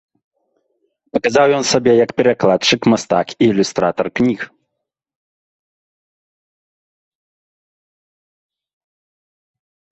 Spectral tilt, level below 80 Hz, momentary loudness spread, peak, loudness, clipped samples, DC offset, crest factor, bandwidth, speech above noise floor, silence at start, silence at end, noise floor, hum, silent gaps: -4.5 dB/octave; -56 dBFS; 6 LU; 0 dBFS; -15 LUFS; under 0.1%; under 0.1%; 18 dB; 8.4 kHz; 64 dB; 1.15 s; 5.45 s; -78 dBFS; none; none